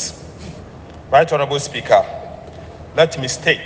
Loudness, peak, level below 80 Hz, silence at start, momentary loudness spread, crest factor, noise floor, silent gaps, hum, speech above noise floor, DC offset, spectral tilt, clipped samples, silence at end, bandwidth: -17 LUFS; 0 dBFS; -46 dBFS; 0 s; 21 LU; 18 dB; -36 dBFS; none; none; 21 dB; under 0.1%; -3.5 dB/octave; under 0.1%; 0 s; 10 kHz